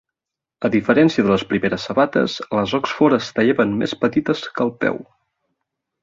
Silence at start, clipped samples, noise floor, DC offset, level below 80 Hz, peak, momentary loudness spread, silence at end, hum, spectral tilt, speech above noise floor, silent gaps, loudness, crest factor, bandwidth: 0.6 s; under 0.1%; -86 dBFS; under 0.1%; -54 dBFS; -2 dBFS; 8 LU; 1 s; none; -6 dB/octave; 68 dB; none; -19 LUFS; 16 dB; 7.6 kHz